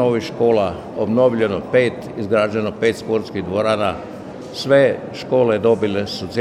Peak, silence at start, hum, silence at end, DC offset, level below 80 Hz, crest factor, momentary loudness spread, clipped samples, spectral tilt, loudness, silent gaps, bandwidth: -2 dBFS; 0 s; none; 0 s; under 0.1%; -52 dBFS; 16 dB; 11 LU; under 0.1%; -6.5 dB/octave; -18 LUFS; none; 12.5 kHz